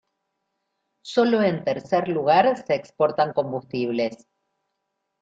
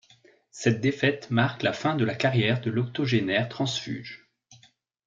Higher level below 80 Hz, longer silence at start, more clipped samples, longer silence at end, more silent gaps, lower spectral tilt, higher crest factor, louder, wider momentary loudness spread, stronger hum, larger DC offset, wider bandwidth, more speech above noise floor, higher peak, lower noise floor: about the same, -68 dBFS vs -66 dBFS; first, 1.05 s vs 0.55 s; neither; first, 1.05 s vs 0.5 s; neither; about the same, -6.5 dB/octave vs -5.5 dB/octave; about the same, 20 dB vs 22 dB; first, -23 LUFS vs -26 LUFS; about the same, 9 LU vs 8 LU; neither; neither; about the same, 7.8 kHz vs 7.6 kHz; first, 56 dB vs 35 dB; about the same, -4 dBFS vs -6 dBFS; first, -78 dBFS vs -61 dBFS